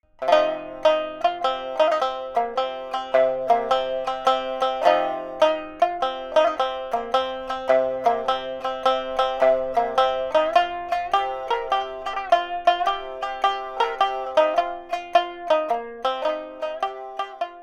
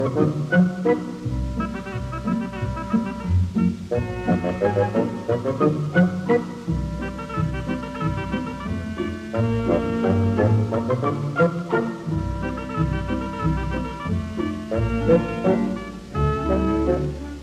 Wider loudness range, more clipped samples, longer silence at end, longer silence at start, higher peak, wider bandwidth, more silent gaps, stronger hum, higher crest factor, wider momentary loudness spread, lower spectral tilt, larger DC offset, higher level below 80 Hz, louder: about the same, 2 LU vs 4 LU; neither; about the same, 0 s vs 0 s; first, 0.2 s vs 0 s; about the same, -4 dBFS vs -4 dBFS; about the same, 11.5 kHz vs 11.5 kHz; neither; neither; about the same, 20 dB vs 18 dB; about the same, 8 LU vs 9 LU; second, -3 dB/octave vs -8 dB/octave; neither; second, -54 dBFS vs -36 dBFS; about the same, -23 LUFS vs -23 LUFS